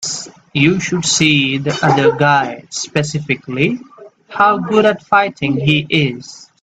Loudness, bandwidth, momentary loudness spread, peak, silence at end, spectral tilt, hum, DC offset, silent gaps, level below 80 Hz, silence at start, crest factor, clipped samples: -14 LUFS; 9.2 kHz; 11 LU; 0 dBFS; 0.2 s; -4.5 dB/octave; none; under 0.1%; none; -52 dBFS; 0 s; 16 dB; under 0.1%